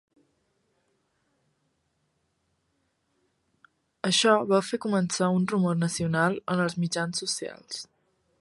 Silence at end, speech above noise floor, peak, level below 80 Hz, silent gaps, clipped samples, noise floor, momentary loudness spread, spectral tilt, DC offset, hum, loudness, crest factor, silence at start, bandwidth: 0.55 s; 49 dB; -6 dBFS; -68 dBFS; none; under 0.1%; -74 dBFS; 12 LU; -4.5 dB/octave; under 0.1%; none; -26 LUFS; 22 dB; 4.05 s; 11.5 kHz